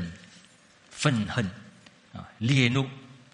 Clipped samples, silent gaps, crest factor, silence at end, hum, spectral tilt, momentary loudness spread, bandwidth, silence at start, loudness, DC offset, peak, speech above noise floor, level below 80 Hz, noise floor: under 0.1%; none; 24 dB; 0.2 s; none; -5.5 dB/octave; 24 LU; 11 kHz; 0 s; -27 LUFS; under 0.1%; -6 dBFS; 32 dB; -58 dBFS; -57 dBFS